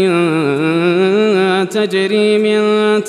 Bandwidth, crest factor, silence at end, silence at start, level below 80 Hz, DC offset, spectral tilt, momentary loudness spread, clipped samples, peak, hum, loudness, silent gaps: 12.5 kHz; 12 dB; 0 s; 0 s; -68 dBFS; under 0.1%; -6 dB/octave; 3 LU; under 0.1%; -2 dBFS; none; -13 LUFS; none